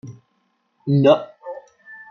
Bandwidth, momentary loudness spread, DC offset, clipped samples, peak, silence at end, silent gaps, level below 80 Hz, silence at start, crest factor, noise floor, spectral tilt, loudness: 6.6 kHz; 25 LU; under 0.1%; under 0.1%; -2 dBFS; 0.15 s; none; -68 dBFS; 0.05 s; 20 dB; -68 dBFS; -8.5 dB/octave; -17 LUFS